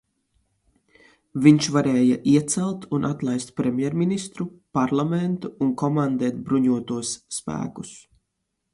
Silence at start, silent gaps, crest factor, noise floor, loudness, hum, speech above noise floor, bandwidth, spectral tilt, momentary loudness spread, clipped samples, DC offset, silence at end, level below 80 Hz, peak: 1.35 s; none; 22 dB; -78 dBFS; -23 LUFS; none; 56 dB; 11.5 kHz; -6 dB/octave; 12 LU; under 0.1%; under 0.1%; 0.75 s; -60 dBFS; -2 dBFS